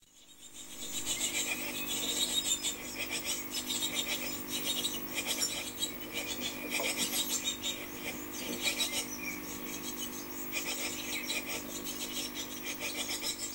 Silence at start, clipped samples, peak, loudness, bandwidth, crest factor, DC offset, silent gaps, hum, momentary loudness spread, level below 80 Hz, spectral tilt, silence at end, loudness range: 0 s; under 0.1%; -18 dBFS; -34 LUFS; 16 kHz; 18 dB; under 0.1%; none; none; 8 LU; -62 dBFS; -0.5 dB/octave; 0 s; 3 LU